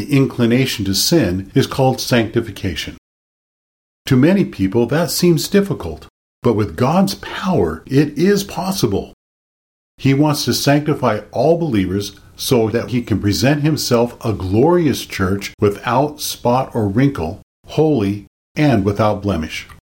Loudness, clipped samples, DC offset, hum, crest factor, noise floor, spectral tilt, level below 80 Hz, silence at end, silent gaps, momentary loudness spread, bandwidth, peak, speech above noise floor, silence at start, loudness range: -17 LUFS; under 0.1%; under 0.1%; none; 14 dB; under -90 dBFS; -5.5 dB/octave; -42 dBFS; 0.15 s; 2.98-4.05 s, 6.10-6.42 s, 9.13-9.98 s, 15.54-15.58 s, 17.43-17.63 s, 18.27-18.55 s; 9 LU; 17 kHz; -2 dBFS; over 74 dB; 0 s; 2 LU